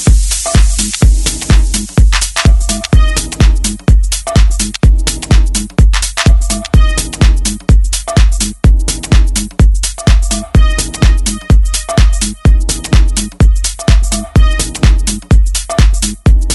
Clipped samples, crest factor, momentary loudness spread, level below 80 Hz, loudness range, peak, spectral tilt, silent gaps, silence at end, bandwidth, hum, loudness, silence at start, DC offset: under 0.1%; 8 dB; 3 LU; -10 dBFS; 1 LU; 0 dBFS; -4.5 dB/octave; none; 0 s; 12 kHz; none; -12 LUFS; 0 s; 0.3%